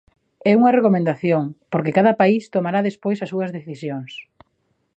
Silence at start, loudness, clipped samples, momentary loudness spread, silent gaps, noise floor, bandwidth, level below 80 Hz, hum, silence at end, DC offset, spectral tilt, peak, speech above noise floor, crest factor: 0.45 s; -19 LUFS; under 0.1%; 14 LU; none; -68 dBFS; 8.2 kHz; -66 dBFS; none; 0.75 s; under 0.1%; -8.5 dB/octave; -2 dBFS; 50 dB; 16 dB